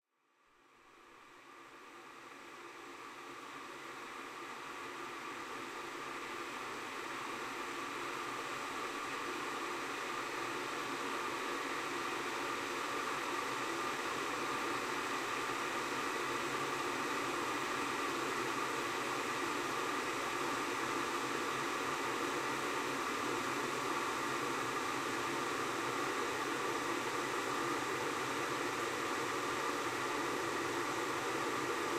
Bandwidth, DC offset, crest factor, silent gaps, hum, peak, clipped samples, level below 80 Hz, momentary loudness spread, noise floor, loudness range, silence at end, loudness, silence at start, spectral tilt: 16.5 kHz; under 0.1%; 16 dB; none; none; -24 dBFS; under 0.1%; -74 dBFS; 10 LU; -74 dBFS; 9 LU; 0 s; -38 LUFS; 0.8 s; -2.5 dB/octave